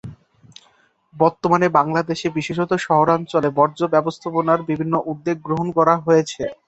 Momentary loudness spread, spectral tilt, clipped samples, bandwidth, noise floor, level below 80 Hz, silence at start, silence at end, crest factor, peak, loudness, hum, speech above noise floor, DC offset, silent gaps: 7 LU; -6.5 dB/octave; under 0.1%; 8.2 kHz; -58 dBFS; -58 dBFS; 0.05 s; 0.15 s; 18 dB; -2 dBFS; -19 LUFS; none; 40 dB; under 0.1%; none